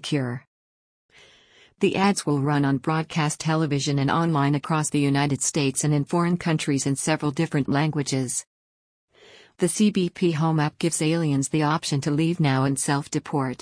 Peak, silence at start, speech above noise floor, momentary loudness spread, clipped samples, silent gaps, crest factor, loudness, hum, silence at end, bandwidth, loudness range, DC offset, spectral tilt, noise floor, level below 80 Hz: -8 dBFS; 0 s; 33 dB; 4 LU; under 0.1%; 0.47-1.09 s, 8.47-9.08 s; 16 dB; -23 LUFS; none; 0.05 s; 10.5 kHz; 3 LU; under 0.1%; -5 dB/octave; -56 dBFS; -60 dBFS